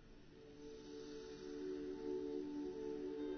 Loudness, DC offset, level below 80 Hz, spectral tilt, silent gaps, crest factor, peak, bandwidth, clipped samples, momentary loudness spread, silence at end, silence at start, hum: -48 LUFS; under 0.1%; -68 dBFS; -5.5 dB/octave; none; 12 dB; -34 dBFS; 6.4 kHz; under 0.1%; 13 LU; 0 s; 0 s; none